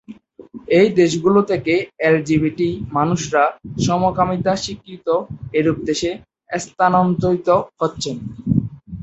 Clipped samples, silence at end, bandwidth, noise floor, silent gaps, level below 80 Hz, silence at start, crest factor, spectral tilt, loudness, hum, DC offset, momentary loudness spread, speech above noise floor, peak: under 0.1%; 0 s; 8.2 kHz; -40 dBFS; none; -46 dBFS; 0.1 s; 16 dB; -6 dB/octave; -18 LUFS; none; under 0.1%; 12 LU; 23 dB; -2 dBFS